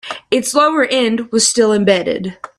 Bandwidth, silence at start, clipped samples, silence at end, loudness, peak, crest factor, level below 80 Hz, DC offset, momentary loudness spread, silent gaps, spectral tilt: 14 kHz; 0.05 s; under 0.1%; 0.15 s; -14 LUFS; 0 dBFS; 14 dB; -56 dBFS; under 0.1%; 7 LU; none; -3 dB/octave